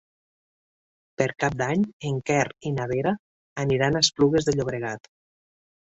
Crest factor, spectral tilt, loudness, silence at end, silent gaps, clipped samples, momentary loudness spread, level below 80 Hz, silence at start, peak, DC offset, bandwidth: 22 dB; -4.5 dB/octave; -25 LUFS; 0.95 s; 1.93-2.00 s, 3.19-3.56 s; under 0.1%; 11 LU; -54 dBFS; 1.2 s; -4 dBFS; under 0.1%; 8.2 kHz